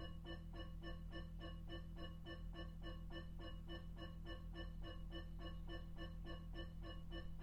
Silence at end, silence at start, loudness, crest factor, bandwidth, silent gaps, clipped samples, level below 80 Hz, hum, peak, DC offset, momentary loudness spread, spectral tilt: 0 s; 0 s; -54 LUFS; 12 dB; 8 kHz; none; under 0.1%; -54 dBFS; none; -38 dBFS; under 0.1%; 1 LU; -6.5 dB/octave